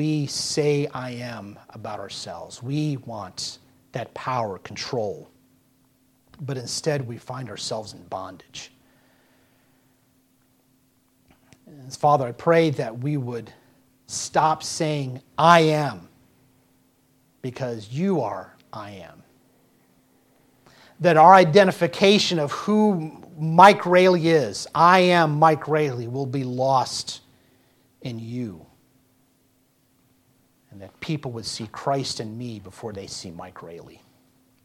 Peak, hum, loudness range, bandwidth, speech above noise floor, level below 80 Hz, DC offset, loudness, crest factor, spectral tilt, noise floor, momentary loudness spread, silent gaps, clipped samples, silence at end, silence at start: 0 dBFS; none; 18 LU; 15.5 kHz; 42 dB; -66 dBFS; under 0.1%; -21 LUFS; 24 dB; -5 dB/octave; -64 dBFS; 22 LU; none; under 0.1%; 0.75 s; 0 s